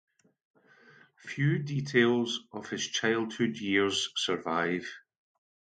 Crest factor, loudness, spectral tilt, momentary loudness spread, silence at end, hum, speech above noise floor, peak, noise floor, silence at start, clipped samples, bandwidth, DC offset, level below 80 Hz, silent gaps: 20 dB; -29 LUFS; -4.5 dB/octave; 13 LU; 0.75 s; none; 29 dB; -12 dBFS; -59 dBFS; 1.25 s; under 0.1%; 9.4 kHz; under 0.1%; -72 dBFS; none